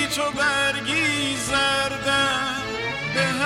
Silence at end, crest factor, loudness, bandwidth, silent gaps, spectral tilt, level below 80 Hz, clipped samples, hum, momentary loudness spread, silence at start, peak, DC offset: 0 s; 16 dB; -22 LUFS; 16 kHz; none; -2.5 dB/octave; -48 dBFS; under 0.1%; none; 6 LU; 0 s; -8 dBFS; under 0.1%